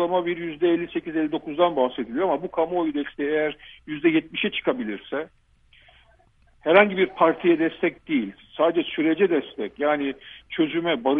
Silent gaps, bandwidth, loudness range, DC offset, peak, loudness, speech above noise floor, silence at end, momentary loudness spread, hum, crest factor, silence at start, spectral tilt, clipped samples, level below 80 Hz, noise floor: none; 3.8 kHz; 5 LU; under 0.1%; -2 dBFS; -23 LUFS; 35 dB; 0 s; 11 LU; none; 22 dB; 0 s; -8.5 dB/octave; under 0.1%; -60 dBFS; -58 dBFS